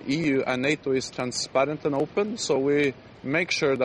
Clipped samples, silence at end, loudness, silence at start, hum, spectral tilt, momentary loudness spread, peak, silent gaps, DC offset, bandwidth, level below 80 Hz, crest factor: under 0.1%; 0 s; -25 LUFS; 0 s; none; -4.5 dB/octave; 5 LU; -8 dBFS; none; under 0.1%; 11 kHz; -62 dBFS; 16 dB